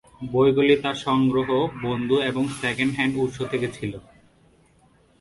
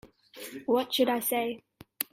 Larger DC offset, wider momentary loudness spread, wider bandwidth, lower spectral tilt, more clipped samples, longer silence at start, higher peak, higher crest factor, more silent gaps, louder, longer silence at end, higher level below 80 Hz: neither; second, 8 LU vs 17 LU; second, 11.5 kHz vs 16 kHz; first, -6 dB/octave vs -2.5 dB/octave; neither; first, 0.2 s vs 0.05 s; about the same, -6 dBFS vs -8 dBFS; second, 18 dB vs 24 dB; neither; first, -23 LUFS vs -29 LUFS; first, 1.2 s vs 0.1 s; first, -54 dBFS vs -72 dBFS